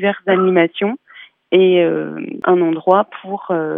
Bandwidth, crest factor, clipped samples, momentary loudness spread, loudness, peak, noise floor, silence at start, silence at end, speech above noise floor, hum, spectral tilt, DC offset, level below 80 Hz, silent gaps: 3.8 kHz; 16 dB; under 0.1%; 11 LU; -15 LUFS; 0 dBFS; -36 dBFS; 0 s; 0 s; 21 dB; none; -9.5 dB/octave; under 0.1%; -78 dBFS; none